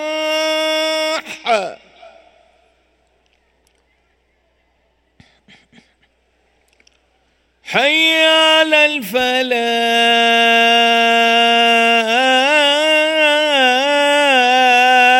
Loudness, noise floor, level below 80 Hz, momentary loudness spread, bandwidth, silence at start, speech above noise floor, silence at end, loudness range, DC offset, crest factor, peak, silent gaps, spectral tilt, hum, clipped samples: -12 LUFS; -61 dBFS; -62 dBFS; 8 LU; 16.5 kHz; 0 s; 48 dB; 0 s; 12 LU; under 0.1%; 14 dB; 0 dBFS; none; -1.5 dB/octave; none; under 0.1%